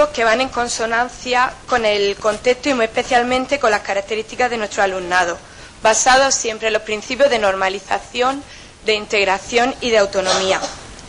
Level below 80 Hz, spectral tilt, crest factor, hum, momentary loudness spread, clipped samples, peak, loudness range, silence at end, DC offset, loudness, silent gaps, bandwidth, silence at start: -44 dBFS; -1.5 dB/octave; 14 dB; none; 7 LU; under 0.1%; -4 dBFS; 2 LU; 0 s; under 0.1%; -17 LUFS; none; 10.5 kHz; 0 s